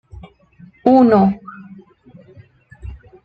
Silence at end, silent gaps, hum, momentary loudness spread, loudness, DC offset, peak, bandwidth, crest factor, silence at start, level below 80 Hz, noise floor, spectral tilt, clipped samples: 0.3 s; none; none; 27 LU; -13 LUFS; under 0.1%; 0 dBFS; 5.2 kHz; 18 dB; 0.15 s; -44 dBFS; -46 dBFS; -10 dB/octave; under 0.1%